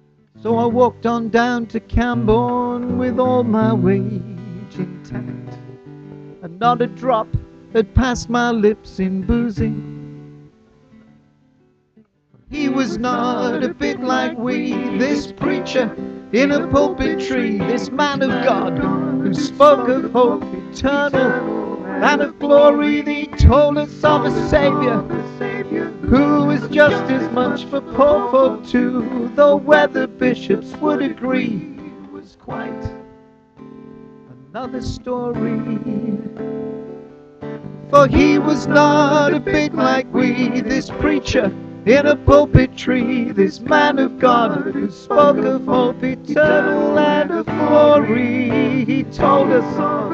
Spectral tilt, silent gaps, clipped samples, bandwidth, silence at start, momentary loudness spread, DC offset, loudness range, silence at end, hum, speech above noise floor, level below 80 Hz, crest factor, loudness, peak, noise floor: -6.5 dB/octave; none; under 0.1%; 7.8 kHz; 0.45 s; 16 LU; under 0.1%; 10 LU; 0 s; none; 41 dB; -34 dBFS; 16 dB; -16 LUFS; 0 dBFS; -57 dBFS